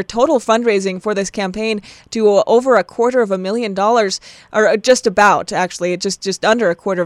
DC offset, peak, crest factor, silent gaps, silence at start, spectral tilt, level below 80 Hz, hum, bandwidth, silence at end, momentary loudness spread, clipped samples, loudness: under 0.1%; 0 dBFS; 14 dB; none; 0 s; -4 dB/octave; -52 dBFS; none; 12.5 kHz; 0 s; 8 LU; under 0.1%; -15 LUFS